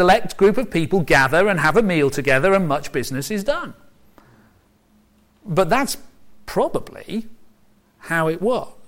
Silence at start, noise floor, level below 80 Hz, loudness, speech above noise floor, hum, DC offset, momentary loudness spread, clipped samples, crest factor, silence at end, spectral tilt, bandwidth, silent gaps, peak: 0 s; -57 dBFS; -42 dBFS; -19 LUFS; 39 dB; none; under 0.1%; 13 LU; under 0.1%; 16 dB; 0 s; -5 dB/octave; 16.5 kHz; none; -4 dBFS